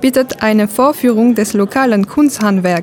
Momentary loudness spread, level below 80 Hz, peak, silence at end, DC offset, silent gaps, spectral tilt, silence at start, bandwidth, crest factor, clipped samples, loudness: 2 LU; -50 dBFS; -2 dBFS; 0 s; under 0.1%; none; -5.5 dB/octave; 0 s; 18 kHz; 10 dB; under 0.1%; -12 LUFS